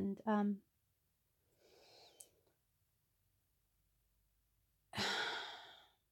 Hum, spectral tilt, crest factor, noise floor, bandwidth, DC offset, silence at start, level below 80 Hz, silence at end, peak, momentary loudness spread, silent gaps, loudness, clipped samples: none; -4.5 dB/octave; 22 dB; -82 dBFS; 17 kHz; under 0.1%; 0 s; -84 dBFS; 0.35 s; -24 dBFS; 23 LU; none; -41 LUFS; under 0.1%